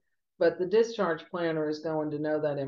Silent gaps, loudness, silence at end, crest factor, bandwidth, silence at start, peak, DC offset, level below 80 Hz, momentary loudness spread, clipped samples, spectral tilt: none; -29 LUFS; 0 s; 14 dB; 7.2 kHz; 0.4 s; -14 dBFS; under 0.1%; -74 dBFS; 6 LU; under 0.1%; -6.5 dB/octave